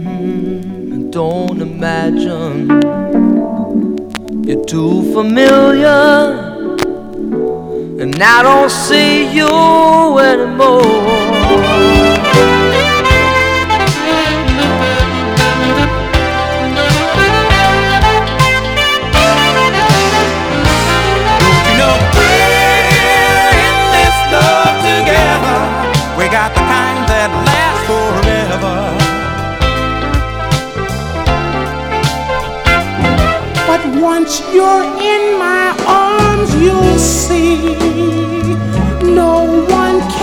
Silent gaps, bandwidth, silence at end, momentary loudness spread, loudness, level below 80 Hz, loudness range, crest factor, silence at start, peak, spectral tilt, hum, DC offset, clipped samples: none; over 20 kHz; 0 s; 9 LU; -10 LUFS; -24 dBFS; 6 LU; 10 dB; 0 s; 0 dBFS; -4.5 dB/octave; none; under 0.1%; 0.3%